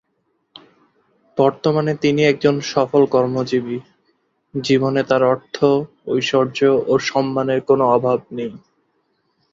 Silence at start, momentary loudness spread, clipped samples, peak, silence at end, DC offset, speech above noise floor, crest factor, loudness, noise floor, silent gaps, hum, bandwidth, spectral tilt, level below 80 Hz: 1.35 s; 11 LU; under 0.1%; -2 dBFS; 0.95 s; under 0.1%; 51 dB; 16 dB; -18 LUFS; -68 dBFS; none; none; 7.6 kHz; -6 dB/octave; -60 dBFS